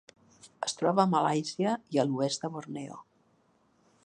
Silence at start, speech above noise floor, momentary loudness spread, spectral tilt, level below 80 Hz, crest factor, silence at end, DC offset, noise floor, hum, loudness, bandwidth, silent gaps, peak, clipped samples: 0.45 s; 39 dB; 15 LU; -5 dB/octave; -78 dBFS; 22 dB; 1.05 s; under 0.1%; -68 dBFS; none; -30 LUFS; 10.5 kHz; none; -10 dBFS; under 0.1%